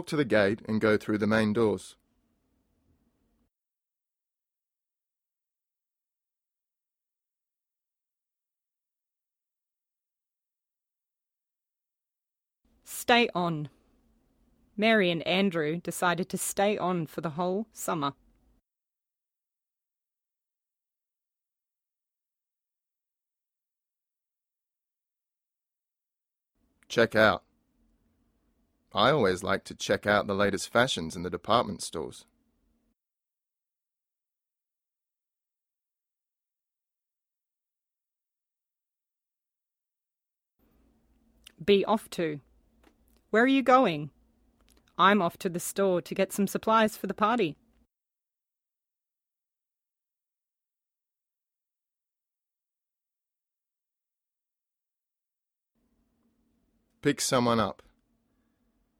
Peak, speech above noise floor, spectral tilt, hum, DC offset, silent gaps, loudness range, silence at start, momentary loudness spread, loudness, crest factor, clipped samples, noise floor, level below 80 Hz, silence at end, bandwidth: -8 dBFS; over 63 dB; -4.5 dB/octave; none; under 0.1%; none; 9 LU; 0 s; 12 LU; -27 LUFS; 26 dB; under 0.1%; under -90 dBFS; -66 dBFS; 1.25 s; 17.5 kHz